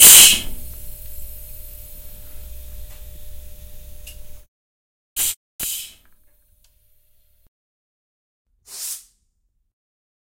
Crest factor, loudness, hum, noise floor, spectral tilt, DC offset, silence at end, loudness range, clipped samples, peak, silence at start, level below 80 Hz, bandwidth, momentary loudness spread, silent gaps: 22 dB; -13 LUFS; none; -68 dBFS; 1.5 dB/octave; under 0.1%; 1.25 s; 11 LU; 0.2%; 0 dBFS; 0 s; -40 dBFS; 16.5 kHz; 27 LU; 4.48-5.16 s, 5.36-5.59 s, 7.48-8.45 s